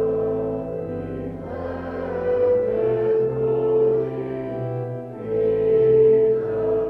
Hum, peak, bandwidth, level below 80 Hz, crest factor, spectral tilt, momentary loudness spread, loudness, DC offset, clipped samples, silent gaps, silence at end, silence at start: none; -8 dBFS; 3.5 kHz; -48 dBFS; 14 dB; -10.5 dB/octave; 13 LU; -22 LUFS; under 0.1%; under 0.1%; none; 0 s; 0 s